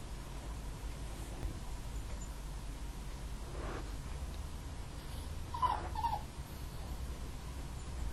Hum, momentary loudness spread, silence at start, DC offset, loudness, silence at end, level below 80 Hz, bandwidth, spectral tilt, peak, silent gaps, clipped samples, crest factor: none; 9 LU; 0 s; under 0.1%; -44 LUFS; 0 s; -44 dBFS; 14 kHz; -5 dB/octave; -22 dBFS; none; under 0.1%; 20 dB